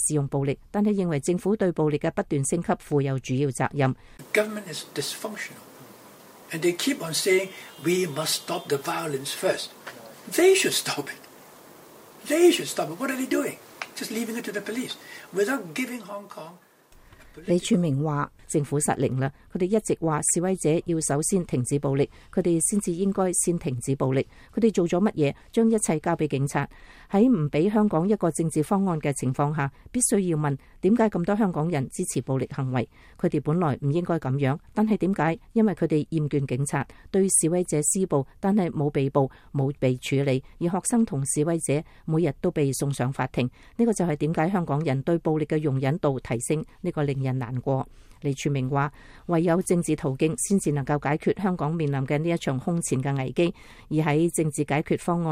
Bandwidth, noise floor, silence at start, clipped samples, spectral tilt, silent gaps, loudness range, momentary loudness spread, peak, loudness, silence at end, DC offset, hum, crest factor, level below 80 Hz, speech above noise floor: 16 kHz; -53 dBFS; 0 s; under 0.1%; -5 dB/octave; none; 4 LU; 8 LU; -8 dBFS; -25 LUFS; 0 s; under 0.1%; none; 18 dB; -54 dBFS; 29 dB